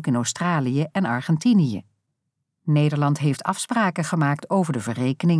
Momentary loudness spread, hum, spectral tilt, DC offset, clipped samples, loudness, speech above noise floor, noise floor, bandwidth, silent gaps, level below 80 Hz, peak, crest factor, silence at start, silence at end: 6 LU; none; -6 dB/octave; under 0.1%; under 0.1%; -22 LUFS; 57 dB; -78 dBFS; 11 kHz; none; -70 dBFS; -8 dBFS; 14 dB; 0 s; 0 s